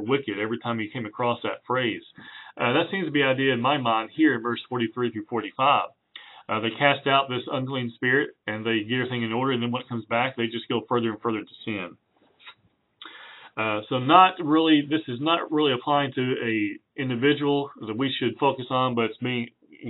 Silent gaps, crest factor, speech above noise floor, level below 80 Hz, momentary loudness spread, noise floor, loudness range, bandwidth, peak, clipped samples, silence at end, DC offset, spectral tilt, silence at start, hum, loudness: none; 22 dB; 39 dB; -74 dBFS; 11 LU; -64 dBFS; 6 LU; 4.1 kHz; -2 dBFS; under 0.1%; 0 s; under 0.1%; -3 dB/octave; 0 s; none; -25 LUFS